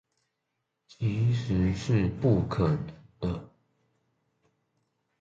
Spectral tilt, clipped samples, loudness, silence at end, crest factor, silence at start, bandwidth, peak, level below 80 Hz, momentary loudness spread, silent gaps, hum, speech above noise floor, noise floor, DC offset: -8 dB/octave; under 0.1%; -28 LUFS; 1.75 s; 20 dB; 1 s; 7.8 kHz; -10 dBFS; -46 dBFS; 9 LU; none; none; 55 dB; -82 dBFS; under 0.1%